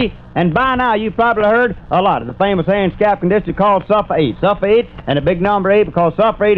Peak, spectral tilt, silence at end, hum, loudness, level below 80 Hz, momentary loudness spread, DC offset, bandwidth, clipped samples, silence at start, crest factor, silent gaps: -2 dBFS; -9 dB/octave; 0 s; none; -14 LUFS; -36 dBFS; 4 LU; 0.3%; 5.4 kHz; under 0.1%; 0 s; 12 dB; none